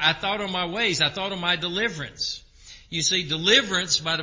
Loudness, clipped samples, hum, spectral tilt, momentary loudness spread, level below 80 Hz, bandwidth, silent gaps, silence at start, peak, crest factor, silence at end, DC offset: -23 LUFS; under 0.1%; none; -2 dB/octave; 11 LU; -54 dBFS; 7.8 kHz; none; 0 s; -4 dBFS; 22 dB; 0 s; under 0.1%